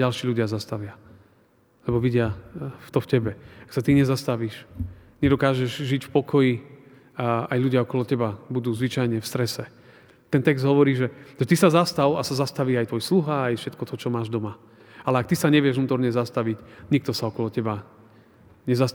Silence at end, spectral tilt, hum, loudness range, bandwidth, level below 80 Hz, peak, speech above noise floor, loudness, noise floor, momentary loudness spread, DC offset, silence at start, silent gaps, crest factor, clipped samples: 0 s; -6.5 dB/octave; none; 4 LU; over 20 kHz; -54 dBFS; -4 dBFS; 37 dB; -24 LUFS; -60 dBFS; 14 LU; under 0.1%; 0 s; none; 20 dB; under 0.1%